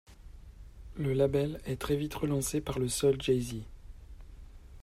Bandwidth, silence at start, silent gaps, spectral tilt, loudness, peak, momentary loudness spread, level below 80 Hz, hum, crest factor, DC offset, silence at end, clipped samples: 15.5 kHz; 0.1 s; none; -5.5 dB/octave; -31 LUFS; -14 dBFS; 19 LU; -48 dBFS; none; 18 dB; under 0.1%; 0 s; under 0.1%